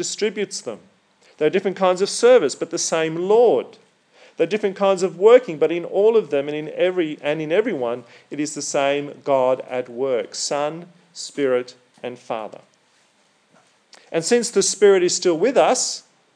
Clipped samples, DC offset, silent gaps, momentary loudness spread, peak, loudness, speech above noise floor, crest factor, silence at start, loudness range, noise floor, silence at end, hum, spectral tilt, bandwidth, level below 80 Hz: under 0.1%; under 0.1%; none; 17 LU; 0 dBFS; -19 LUFS; 41 dB; 20 dB; 0 s; 8 LU; -60 dBFS; 0.35 s; none; -3.5 dB/octave; 10.5 kHz; under -90 dBFS